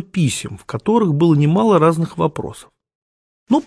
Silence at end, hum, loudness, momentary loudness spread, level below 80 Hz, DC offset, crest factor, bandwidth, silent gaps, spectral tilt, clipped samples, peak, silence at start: 0.05 s; none; -16 LUFS; 13 LU; -52 dBFS; under 0.1%; 16 dB; 11 kHz; 2.95-3.46 s; -7 dB/octave; under 0.1%; -2 dBFS; 0 s